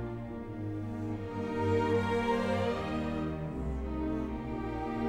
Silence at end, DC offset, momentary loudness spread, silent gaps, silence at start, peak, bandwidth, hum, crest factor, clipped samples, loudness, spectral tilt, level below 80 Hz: 0 s; under 0.1%; 9 LU; none; 0 s; -18 dBFS; 12.5 kHz; none; 16 dB; under 0.1%; -34 LUFS; -7.5 dB/octave; -44 dBFS